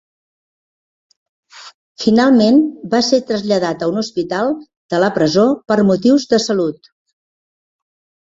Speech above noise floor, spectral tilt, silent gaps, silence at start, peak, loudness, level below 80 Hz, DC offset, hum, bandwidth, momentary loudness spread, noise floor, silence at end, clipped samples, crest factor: over 76 dB; -5.5 dB/octave; 1.74-1.95 s, 4.77-4.89 s; 1.55 s; -2 dBFS; -15 LUFS; -58 dBFS; under 0.1%; none; 7.8 kHz; 9 LU; under -90 dBFS; 1.55 s; under 0.1%; 16 dB